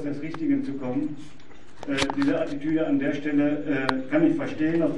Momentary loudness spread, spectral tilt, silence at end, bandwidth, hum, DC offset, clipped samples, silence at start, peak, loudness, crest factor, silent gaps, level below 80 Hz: 7 LU; -6 dB/octave; 0 s; 11 kHz; none; 2%; under 0.1%; 0 s; -2 dBFS; -26 LUFS; 22 dB; none; -56 dBFS